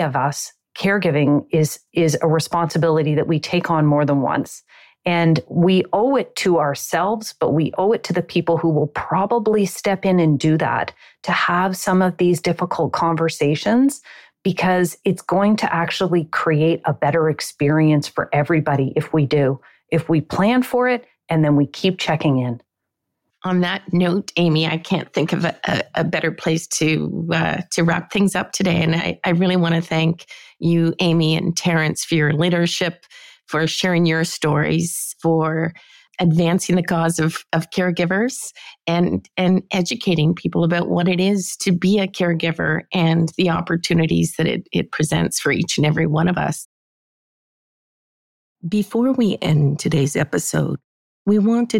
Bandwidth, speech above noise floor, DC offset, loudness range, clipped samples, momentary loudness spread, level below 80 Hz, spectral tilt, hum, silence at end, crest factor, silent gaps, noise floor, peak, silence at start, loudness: 16.5 kHz; 61 dB; under 0.1%; 2 LU; under 0.1%; 5 LU; -54 dBFS; -5.5 dB/octave; none; 0 s; 12 dB; 46.65-48.56 s, 50.84-51.25 s; -79 dBFS; -6 dBFS; 0 s; -19 LUFS